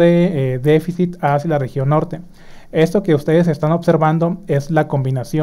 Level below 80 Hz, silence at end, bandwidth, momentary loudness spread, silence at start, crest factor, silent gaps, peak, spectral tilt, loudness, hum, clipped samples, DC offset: -44 dBFS; 0 s; 15 kHz; 5 LU; 0 s; 14 dB; none; -2 dBFS; -8 dB/octave; -16 LUFS; none; under 0.1%; under 0.1%